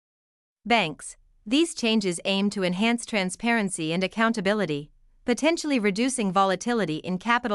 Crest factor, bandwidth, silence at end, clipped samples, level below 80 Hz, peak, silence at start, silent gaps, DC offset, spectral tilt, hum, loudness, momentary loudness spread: 18 dB; 12 kHz; 0 s; under 0.1%; -60 dBFS; -8 dBFS; 0.65 s; none; under 0.1%; -4 dB/octave; none; -25 LUFS; 7 LU